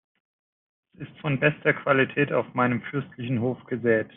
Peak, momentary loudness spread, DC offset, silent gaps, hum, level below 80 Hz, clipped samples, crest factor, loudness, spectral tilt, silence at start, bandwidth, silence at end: -6 dBFS; 11 LU; under 0.1%; none; none; -66 dBFS; under 0.1%; 20 dB; -25 LUFS; -10.5 dB/octave; 1 s; 3.9 kHz; 0.1 s